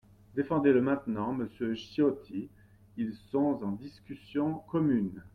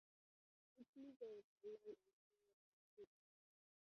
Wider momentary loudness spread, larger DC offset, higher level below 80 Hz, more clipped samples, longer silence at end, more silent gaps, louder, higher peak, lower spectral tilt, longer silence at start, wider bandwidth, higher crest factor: first, 15 LU vs 10 LU; neither; first, -64 dBFS vs under -90 dBFS; neither; second, 0.05 s vs 0.9 s; second, none vs 0.88-0.93 s, 1.16-1.20 s, 1.44-1.56 s, 2.13-2.30 s, 2.53-2.97 s; first, -31 LUFS vs -61 LUFS; first, -12 dBFS vs -46 dBFS; first, -8.5 dB/octave vs -5.5 dB/octave; second, 0.35 s vs 0.75 s; about the same, 6.2 kHz vs 6.2 kHz; about the same, 18 dB vs 18 dB